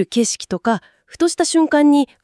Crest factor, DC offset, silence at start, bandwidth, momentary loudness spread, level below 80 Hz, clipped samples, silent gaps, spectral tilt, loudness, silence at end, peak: 12 dB; under 0.1%; 0 s; 12 kHz; 8 LU; -58 dBFS; under 0.1%; none; -3.5 dB/octave; -17 LUFS; 0.2 s; -4 dBFS